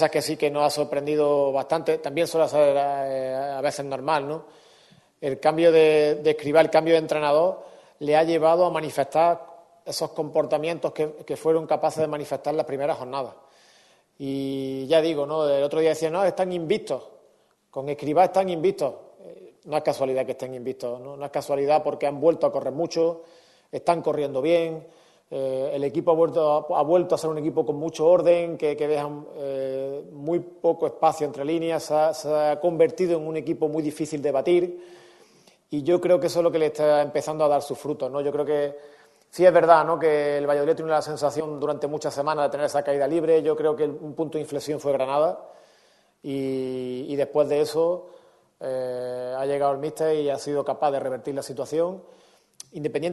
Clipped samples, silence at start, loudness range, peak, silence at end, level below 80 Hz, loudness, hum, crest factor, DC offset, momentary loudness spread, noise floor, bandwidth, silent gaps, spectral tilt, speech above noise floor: under 0.1%; 0 s; 6 LU; -2 dBFS; 0 s; -70 dBFS; -24 LUFS; none; 22 dB; under 0.1%; 11 LU; -62 dBFS; 12.5 kHz; none; -5.5 dB/octave; 38 dB